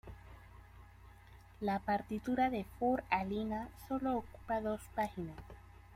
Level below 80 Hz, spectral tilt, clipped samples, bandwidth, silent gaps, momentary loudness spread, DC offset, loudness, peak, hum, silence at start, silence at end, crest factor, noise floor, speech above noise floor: -58 dBFS; -7 dB/octave; under 0.1%; 16 kHz; none; 23 LU; under 0.1%; -38 LUFS; -18 dBFS; none; 0.05 s; 0 s; 22 dB; -58 dBFS; 21 dB